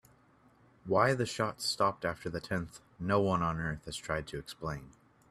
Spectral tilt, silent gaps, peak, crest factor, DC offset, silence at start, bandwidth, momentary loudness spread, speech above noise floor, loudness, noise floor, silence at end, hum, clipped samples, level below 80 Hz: -5 dB/octave; none; -12 dBFS; 22 dB; under 0.1%; 0.85 s; 15 kHz; 12 LU; 31 dB; -33 LUFS; -64 dBFS; 0.4 s; none; under 0.1%; -58 dBFS